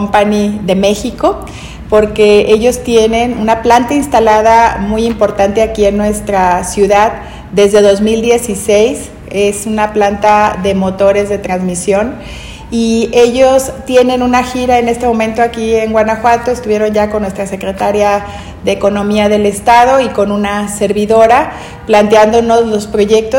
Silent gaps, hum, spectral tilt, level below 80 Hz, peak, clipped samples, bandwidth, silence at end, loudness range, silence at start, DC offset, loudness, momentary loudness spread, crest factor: none; none; -5 dB/octave; -32 dBFS; 0 dBFS; 2%; 17 kHz; 0 s; 3 LU; 0 s; under 0.1%; -10 LUFS; 8 LU; 10 dB